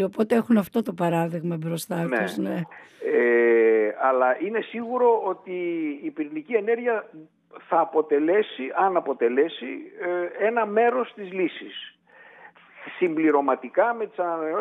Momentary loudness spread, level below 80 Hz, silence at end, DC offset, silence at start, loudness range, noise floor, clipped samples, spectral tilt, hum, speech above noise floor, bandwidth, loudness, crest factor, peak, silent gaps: 11 LU; -78 dBFS; 0 s; under 0.1%; 0 s; 4 LU; -51 dBFS; under 0.1%; -6.5 dB/octave; none; 27 dB; 14.5 kHz; -24 LUFS; 18 dB; -6 dBFS; none